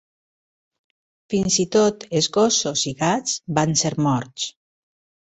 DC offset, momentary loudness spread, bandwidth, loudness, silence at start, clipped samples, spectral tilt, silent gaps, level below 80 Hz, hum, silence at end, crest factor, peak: under 0.1%; 8 LU; 8.4 kHz; -20 LUFS; 1.3 s; under 0.1%; -4 dB/octave; none; -56 dBFS; none; 0.7 s; 20 dB; -4 dBFS